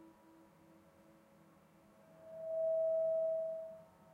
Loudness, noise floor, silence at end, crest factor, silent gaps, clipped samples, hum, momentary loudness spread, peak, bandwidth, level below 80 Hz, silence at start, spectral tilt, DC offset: -38 LUFS; -66 dBFS; 0.3 s; 12 dB; none; under 0.1%; none; 21 LU; -30 dBFS; 3.3 kHz; -88 dBFS; 0 s; -7 dB/octave; under 0.1%